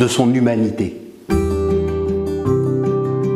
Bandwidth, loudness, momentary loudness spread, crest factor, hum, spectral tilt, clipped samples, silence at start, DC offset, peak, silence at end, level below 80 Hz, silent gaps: 14.5 kHz; -18 LUFS; 7 LU; 16 dB; none; -6.5 dB/octave; under 0.1%; 0 s; under 0.1%; 0 dBFS; 0 s; -32 dBFS; none